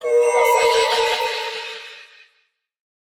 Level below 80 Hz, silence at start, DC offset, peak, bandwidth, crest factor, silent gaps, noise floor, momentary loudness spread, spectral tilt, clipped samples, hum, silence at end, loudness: -60 dBFS; 0 s; under 0.1%; -6 dBFS; 18.5 kHz; 14 dB; none; -66 dBFS; 16 LU; 0.5 dB/octave; under 0.1%; none; 1 s; -18 LUFS